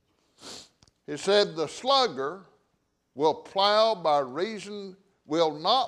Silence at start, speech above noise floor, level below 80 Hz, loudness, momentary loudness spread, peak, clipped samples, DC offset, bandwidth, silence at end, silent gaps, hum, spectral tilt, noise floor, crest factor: 0.45 s; 48 dB; -74 dBFS; -26 LUFS; 20 LU; -8 dBFS; under 0.1%; under 0.1%; 11.5 kHz; 0 s; none; none; -3.5 dB/octave; -74 dBFS; 18 dB